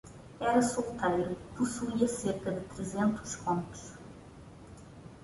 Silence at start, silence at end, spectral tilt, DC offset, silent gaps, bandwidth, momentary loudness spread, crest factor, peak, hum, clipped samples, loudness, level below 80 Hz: 0.05 s; 0 s; -5.5 dB/octave; under 0.1%; none; 11.5 kHz; 22 LU; 20 dB; -14 dBFS; none; under 0.1%; -32 LUFS; -58 dBFS